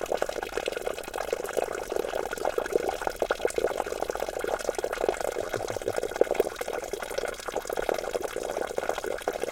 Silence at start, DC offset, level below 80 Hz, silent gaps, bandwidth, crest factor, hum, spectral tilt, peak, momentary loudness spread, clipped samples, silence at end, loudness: 0 s; under 0.1%; -50 dBFS; none; 17 kHz; 24 dB; none; -3 dB/octave; -6 dBFS; 5 LU; under 0.1%; 0 s; -31 LUFS